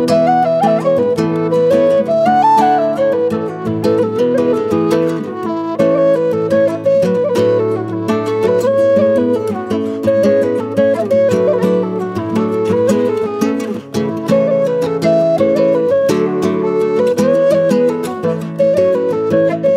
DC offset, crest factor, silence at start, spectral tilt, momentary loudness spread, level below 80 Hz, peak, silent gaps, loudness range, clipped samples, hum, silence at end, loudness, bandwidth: under 0.1%; 14 dB; 0 s; -7 dB/octave; 7 LU; -58 dBFS; 0 dBFS; none; 2 LU; under 0.1%; none; 0 s; -14 LUFS; 15 kHz